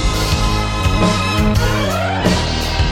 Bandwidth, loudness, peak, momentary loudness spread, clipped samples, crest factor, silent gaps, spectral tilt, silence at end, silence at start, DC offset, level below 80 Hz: 17 kHz; -16 LUFS; -2 dBFS; 2 LU; under 0.1%; 14 dB; none; -5 dB/octave; 0 s; 0 s; under 0.1%; -22 dBFS